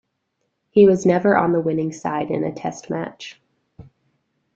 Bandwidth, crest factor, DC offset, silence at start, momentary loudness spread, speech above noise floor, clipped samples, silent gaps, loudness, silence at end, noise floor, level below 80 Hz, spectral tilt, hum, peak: 7.8 kHz; 20 dB; under 0.1%; 0.75 s; 16 LU; 55 dB; under 0.1%; none; -19 LUFS; 0.75 s; -73 dBFS; -58 dBFS; -7 dB/octave; none; -2 dBFS